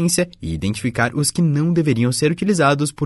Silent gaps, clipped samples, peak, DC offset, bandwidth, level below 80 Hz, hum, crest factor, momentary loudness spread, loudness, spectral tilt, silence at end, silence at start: none; under 0.1%; -4 dBFS; under 0.1%; 12 kHz; -44 dBFS; none; 14 dB; 6 LU; -18 LUFS; -5 dB/octave; 0 s; 0 s